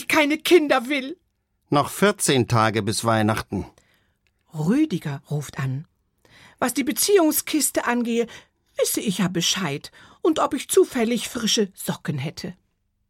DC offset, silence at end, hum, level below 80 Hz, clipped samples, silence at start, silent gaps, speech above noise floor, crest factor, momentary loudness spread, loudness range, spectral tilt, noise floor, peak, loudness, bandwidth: under 0.1%; 0.55 s; none; -56 dBFS; under 0.1%; 0 s; none; 46 dB; 18 dB; 14 LU; 5 LU; -4 dB/octave; -67 dBFS; -4 dBFS; -22 LUFS; 16.5 kHz